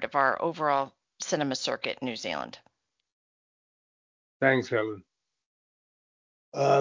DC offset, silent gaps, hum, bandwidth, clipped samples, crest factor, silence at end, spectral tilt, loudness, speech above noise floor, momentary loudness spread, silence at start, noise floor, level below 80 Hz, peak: under 0.1%; 3.12-4.40 s, 5.46-6.52 s; none; 7.6 kHz; under 0.1%; 24 dB; 0 s; -4 dB/octave; -29 LUFS; over 63 dB; 13 LU; 0 s; under -90 dBFS; -72 dBFS; -8 dBFS